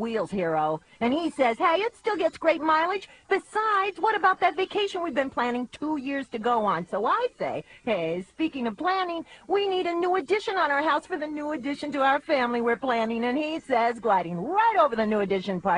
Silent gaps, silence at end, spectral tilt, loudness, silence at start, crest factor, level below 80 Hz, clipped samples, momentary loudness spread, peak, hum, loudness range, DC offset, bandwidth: none; 0 s; -5.5 dB/octave; -26 LUFS; 0 s; 16 dB; -64 dBFS; under 0.1%; 8 LU; -8 dBFS; none; 3 LU; under 0.1%; 11 kHz